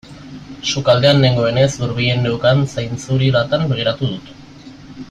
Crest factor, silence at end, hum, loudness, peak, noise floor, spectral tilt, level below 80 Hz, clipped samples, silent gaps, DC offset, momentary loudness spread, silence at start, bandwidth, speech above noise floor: 16 dB; 0 s; none; -16 LUFS; -2 dBFS; -38 dBFS; -5.5 dB/octave; -44 dBFS; under 0.1%; none; under 0.1%; 17 LU; 0.05 s; 9 kHz; 22 dB